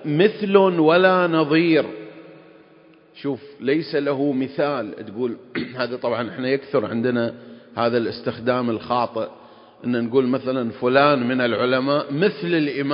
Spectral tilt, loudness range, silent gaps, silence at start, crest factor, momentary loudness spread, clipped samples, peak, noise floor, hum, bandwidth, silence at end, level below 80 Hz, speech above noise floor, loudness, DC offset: -11 dB/octave; 6 LU; none; 0 s; 20 dB; 13 LU; under 0.1%; -2 dBFS; -51 dBFS; none; 5.4 kHz; 0 s; -64 dBFS; 31 dB; -21 LUFS; under 0.1%